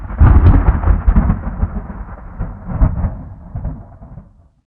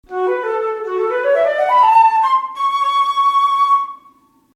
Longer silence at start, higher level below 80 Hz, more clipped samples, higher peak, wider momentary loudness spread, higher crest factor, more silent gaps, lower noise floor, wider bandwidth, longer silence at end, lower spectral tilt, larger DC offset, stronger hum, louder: about the same, 0 s vs 0.1 s; first, -16 dBFS vs -64 dBFS; neither; first, 0 dBFS vs -4 dBFS; first, 21 LU vs 9 LU; about the same, 14 dB vs 12 dB; neither; second, -40 dBFS vs -50 dBFS; second, 3.2 kHz vs 12.5 kHz; about the same, 0.55 s vs 0.6 s; first, -12.5 dB/octave vs -2.5 dB/octave; neither; neither; about the same, -15 LUFS vs -15 LUFS